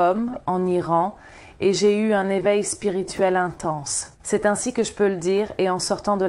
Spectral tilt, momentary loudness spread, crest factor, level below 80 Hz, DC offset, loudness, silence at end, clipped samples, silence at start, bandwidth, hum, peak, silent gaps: -4.5 dB/octave; 6 LU; 14 dB; -54 dBFS; under 0.1%; -22 LUFS; 0 s; under 0.1%; 0 s; 12.5 kHz; none; -6 dBFS; none